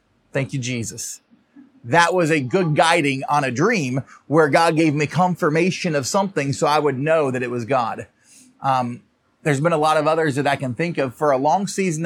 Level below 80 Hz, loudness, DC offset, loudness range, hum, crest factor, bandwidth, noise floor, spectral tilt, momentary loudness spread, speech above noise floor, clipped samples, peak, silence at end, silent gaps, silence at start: -68 dBFS; -19 LUFS; under 0.1%; 3 LU; none; 18 dB; 16 kHz; -50 dBFS; -5 dB/octave; 10 LU; 31 dB; under 0.1%; -2 dBFS; 0 s; none; 0.35 s